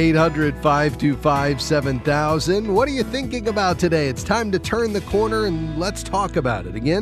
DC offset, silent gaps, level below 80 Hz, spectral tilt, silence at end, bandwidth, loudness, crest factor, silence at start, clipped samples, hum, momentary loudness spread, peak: under 0.1%; none; -36 dBFS; -5.5 dB/octave; 0 s; 14 kHz; -20 LUFS; 16 dB; 0 s; under 0.1%; none; 5 LU; -4 dBFS